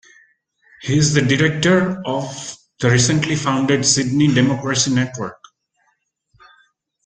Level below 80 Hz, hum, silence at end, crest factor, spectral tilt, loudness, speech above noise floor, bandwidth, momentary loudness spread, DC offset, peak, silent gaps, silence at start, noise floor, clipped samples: -50 dBFS; none; 1.7 s; 18 dB; -4.5 dB/octave; -17 LUFS; 50 dB; 9.6 kHz; 14 LU; under 0.1%; -2 dBFS; none; 0.8 s; -67 dBFS; under 0.1%